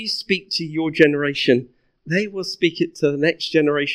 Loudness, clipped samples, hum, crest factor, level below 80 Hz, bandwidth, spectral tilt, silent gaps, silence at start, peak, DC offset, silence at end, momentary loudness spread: -20 LUFS; under 0.1%; none; 20 dB; -62 dBFS; 13 kHz; -5.5 dB/octave; none; 0 s; 0 dBFS; under 0.1%; 0 s; 7 LU